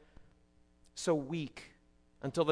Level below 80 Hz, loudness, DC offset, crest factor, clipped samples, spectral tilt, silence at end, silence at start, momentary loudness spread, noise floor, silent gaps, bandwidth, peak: -66 dBFS; -37 LUFS; under 0.1%; 22 dB; under 0.1%; -5.5 dB/octave; 0 s; 0.2 s; 18 LU; -67 dBFS; none; 11 kHz; -16 dBFS